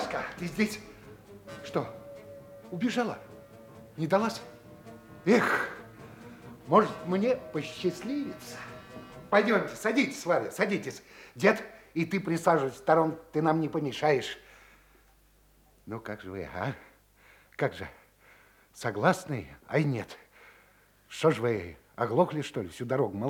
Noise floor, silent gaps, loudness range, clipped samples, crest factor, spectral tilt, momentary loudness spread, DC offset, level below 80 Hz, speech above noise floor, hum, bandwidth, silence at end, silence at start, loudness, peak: -62 dBFS; none; 9 LU; under 0.1%; 22 dB; -6 dB/octave; 22 LU; under 0.1%; -66 dBFS; 33 dB; none; 19.5 kHz; 0 s; 0 s; -29 LUFS; -8 dBFS